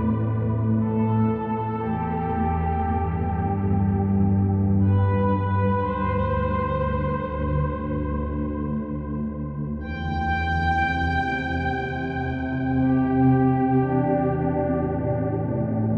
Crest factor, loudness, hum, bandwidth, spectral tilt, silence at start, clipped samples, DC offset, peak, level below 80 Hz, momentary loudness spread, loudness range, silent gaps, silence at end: 14 dB; -24 LUFS; none; 5.8 kHz; -10 dB/octave; 0 s; under 0.1%; under 0.1%; -10 dBFS; -36 dBFS; 7 LU; 4 LU; none; 0 s